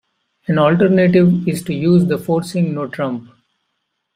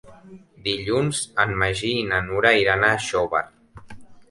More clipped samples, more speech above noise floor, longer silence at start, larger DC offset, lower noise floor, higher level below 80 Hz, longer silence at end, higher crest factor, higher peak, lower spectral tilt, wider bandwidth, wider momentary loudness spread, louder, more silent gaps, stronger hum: neither; first, 57 dB vs 25 dB; first, 0.5 s vs 0.05 s; neither; first, -72 dBFS vs -46 dBFS; second, -52 dBFS vs -46 dBFS; first, 0.95 s vs 0.1 s; second, 14 dB vs 20 dB; about the same, -2 dBFS vs -2 dBFS; first, -7.5 dB/octave vs -4 dB/octave; first, 14 kHz vs 11.5 kHz; about the same, 11 LU vs 9 LU; first, -15 LUFS vs -21 LUFS; neither; neither